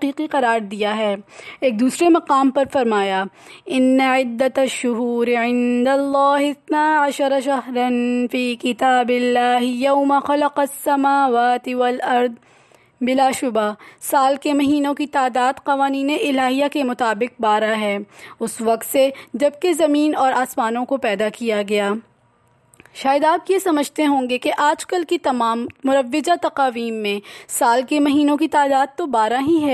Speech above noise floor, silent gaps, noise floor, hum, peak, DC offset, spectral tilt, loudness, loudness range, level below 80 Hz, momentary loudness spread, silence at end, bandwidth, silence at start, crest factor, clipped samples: 40 dB; none; -58 dBFS; none; -6 dBFS; under 0.1%; -3.5 dB/octave; -18 LUFS; 2 LU; -64 dBFS; 6 LU; 0 s; 13.5 kHz; 0 s; 14 dB; under 0.1%